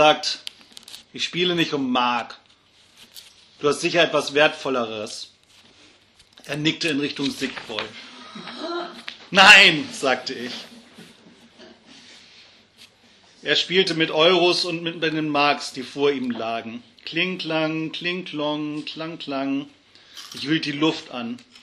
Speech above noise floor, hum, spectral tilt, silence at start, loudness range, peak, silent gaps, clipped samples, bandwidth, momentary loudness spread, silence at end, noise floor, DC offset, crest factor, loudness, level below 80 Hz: 35 dB; none; -3.5 dB/octave; 0 s; 11 LU; 0 dBFS; none; under 0.1%; 14.5 kHz; 19 LU; 0.25 s; -56 dBFS; under 0.1%; 24 dB; -20 LUFS; -66 dBFS